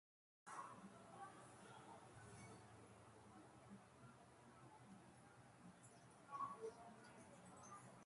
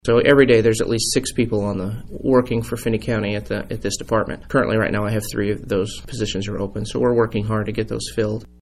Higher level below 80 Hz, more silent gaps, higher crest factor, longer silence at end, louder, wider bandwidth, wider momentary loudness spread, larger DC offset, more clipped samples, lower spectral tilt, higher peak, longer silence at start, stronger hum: second, -84 dBFS vs -38 dBFS; neither; about the same, 22 dB vs 18 dB; second, 0 s vs 0.15 s; second, -61 LUFS vs -20 LUFS; second, 11.5 kHz vs 15 kHz; about the same, 11 LU vs 11 LU; neither; neither; about the same, -4.5 dB/octave vs -5 dB/octave; second, -38 dBFS vs -2 dBFS; first, 0.45 s vs 0.05 s; neither